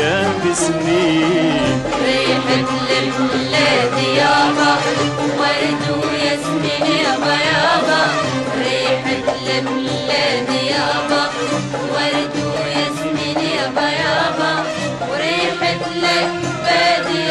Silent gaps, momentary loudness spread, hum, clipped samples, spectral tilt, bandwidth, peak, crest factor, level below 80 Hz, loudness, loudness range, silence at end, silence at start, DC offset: none; 5 LU; none; under 0.1%; -4 dB/octave; 12 kHz; -4 dBFS; 12 dB; -48 dBFS; -16 LUFS; 3 LU; 0 s; 0 s; under 0.1%